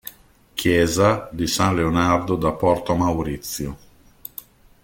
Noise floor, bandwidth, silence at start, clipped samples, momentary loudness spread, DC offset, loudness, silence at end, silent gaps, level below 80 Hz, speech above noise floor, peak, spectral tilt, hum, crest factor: -50 dBFS; 17 kHz; 0.05 s; under 0.1%; 18 LU; under 0.1%; -20 LUFS; 1.05 s; none; -42 dBFS; 30 dB; -4 dBFS; -5 dB/octave; none; 18 dB